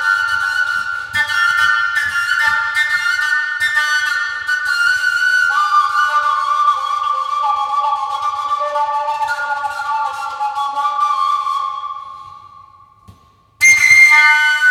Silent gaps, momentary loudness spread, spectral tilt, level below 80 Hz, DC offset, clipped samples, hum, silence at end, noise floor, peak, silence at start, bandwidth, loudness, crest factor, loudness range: none; 11 LU; 1.5 dB/octave; -58 dBFS; under 0.1%; under 0.1%; none; 0 s; -48 dBFS; 0 dBFS; 0 s; 17.5 kHz; -14 LUFS; 16 dB; 6 LU